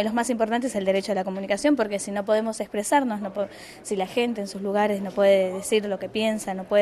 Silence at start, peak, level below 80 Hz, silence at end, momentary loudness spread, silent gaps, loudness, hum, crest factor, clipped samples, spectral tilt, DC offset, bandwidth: 0 s; -8 dBFS; -62 dBFS; 0 s; 7 LU; none; -25 LUFS; none; 16 dB; under 0.1%; -4.5 dB/octave; under 0.1%; 13.5 kHz